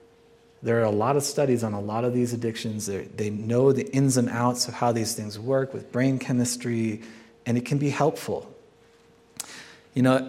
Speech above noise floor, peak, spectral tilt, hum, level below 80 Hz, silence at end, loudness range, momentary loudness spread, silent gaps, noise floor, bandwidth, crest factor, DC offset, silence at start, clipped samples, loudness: 32 dB; -6 dBFS; -5.5 dB/octave; none; -68 dBFS; 0 s; 4 LU; 12 LU; none; -57 dBFS; 16 kHz; 20 dB; under 0.1%; 0.6 s; under 0.1%; -25 LUFS